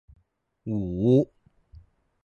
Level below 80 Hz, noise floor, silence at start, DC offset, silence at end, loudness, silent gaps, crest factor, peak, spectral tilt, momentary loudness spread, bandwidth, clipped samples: -52 dBFS; -69 dBFS; 0.65 s; under 0.1%; 1 s; -25 LUFS; none; 18 dB; -10 dBFS; -10.5 dB/octave; 13 LU; 7 kHz; under 0.1%